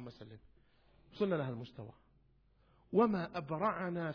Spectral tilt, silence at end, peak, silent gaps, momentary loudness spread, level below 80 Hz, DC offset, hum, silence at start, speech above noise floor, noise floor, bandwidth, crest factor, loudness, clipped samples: -6.5 dB/octave; 0 s; -18 dBFS; none; 22 LU; -70 dBFS; under 0.1%; none; 0 s; 33 dB; -70 dBFS; 5.4 kHz; 22 dB; -36 LUFS; under 0.1%